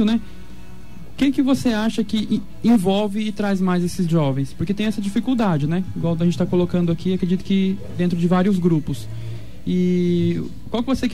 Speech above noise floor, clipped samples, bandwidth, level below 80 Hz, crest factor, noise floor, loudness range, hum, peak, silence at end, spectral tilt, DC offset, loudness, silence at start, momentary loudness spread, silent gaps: 21 dB; under 0.1%; 14 kHz; -44 dBFS; 14 dB; -40 dBFS; 1 LU; none; -6 dBFS; 0 s; -7 dB/octave; 3%; -21 LUFS; 0 s; 8 LU; none